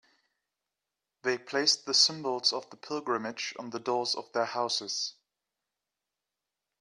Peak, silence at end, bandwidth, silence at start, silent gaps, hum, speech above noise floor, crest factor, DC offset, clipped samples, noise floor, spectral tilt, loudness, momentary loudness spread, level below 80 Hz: -10 dBFS; 1.7 s; 12 kHz; 1.25 s; none; 50 Hz at -75 dBFS; 57 dB; 24 dB; under 0.1%; under 0.1%; -88 dBFS; -1 dB/octave; -29 LUFS; 13 LU; -82 dBFS